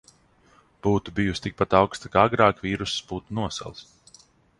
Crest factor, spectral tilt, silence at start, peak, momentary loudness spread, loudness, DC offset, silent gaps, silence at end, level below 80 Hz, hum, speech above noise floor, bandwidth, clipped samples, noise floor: 22 dB; -5.5 dB/octave; 0.85 s; -2 dBFS; 12 LU; -24 LUFS; under 0.1%; none; 0.75 s; -48 dBFS; none; 35 dB; 11.5 kHz; under 0.1%; -59 dBFS